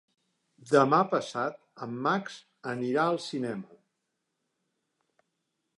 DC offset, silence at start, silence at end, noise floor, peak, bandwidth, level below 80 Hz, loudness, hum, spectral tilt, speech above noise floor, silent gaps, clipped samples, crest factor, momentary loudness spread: under 0.1%; 0.65 s; 2.1 s; -82 dBFS; -8 dBFS; 11.5 kHz; -82 dBFS; -28 LUFS; none; -6 dB/octave; 53 dB; none; under 0.1%; 22 dB; 17 LU